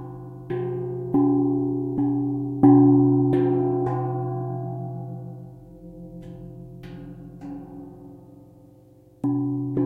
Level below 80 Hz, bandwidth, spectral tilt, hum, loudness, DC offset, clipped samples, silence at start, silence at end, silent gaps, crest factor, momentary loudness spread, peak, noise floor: -54 dBFS; 3.4 kHz; -12 dB/octave; none; -22 LUFS; under 0.1%; under 0.1%; 0 s; 0 s; none; 20 dB; 24 LU; -4 dBFS; -52 dBFS